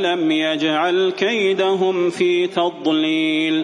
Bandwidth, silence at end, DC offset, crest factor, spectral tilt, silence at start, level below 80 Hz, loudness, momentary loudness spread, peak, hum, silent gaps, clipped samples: 10.5 kHz; 0 s; under 0.1%; 14 dB; -5 dB/octave; 0 s; -68 dBFS; -18 LUFS; 2 LU; -4 dBFS; none; none; under 0.1%